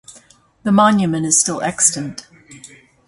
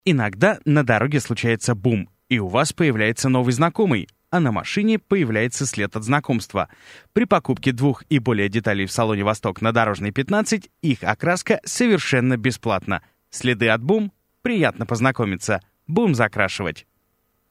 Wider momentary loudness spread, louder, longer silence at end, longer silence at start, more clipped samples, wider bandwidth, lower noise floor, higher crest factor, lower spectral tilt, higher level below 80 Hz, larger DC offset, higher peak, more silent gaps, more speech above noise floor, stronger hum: first, 14 LU vs 7 LU; first, -15 LUFS vs -21 LUFS; second, 0.4 s vs 0.7 s; about the same, 0.1 s vs 0.05 s; neither; second, 11.5 kHz vs 15 kHz; second, -49 dBFS vs -68 dBFS; about the same, 18 dB vs 20 dB; second, -3.5 dB/octave vs -5.5 dB/octave; about the same, -56 dBFS vs -56 dBFS; neither; about the same, 0 dBFS vs 0 dBFS; neither; second, 33 dB vs 48 dB; neither